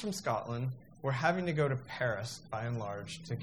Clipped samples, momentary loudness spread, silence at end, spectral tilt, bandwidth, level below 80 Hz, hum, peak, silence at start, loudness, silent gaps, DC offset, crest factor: under 0.1%; 9 LU; 0 s; -5.5 dB/octave; 14.5 kHz; -66 dBFS; none; -16 dBFS; 0 s; -35 LUFS; none; under 0.1%; 20 dB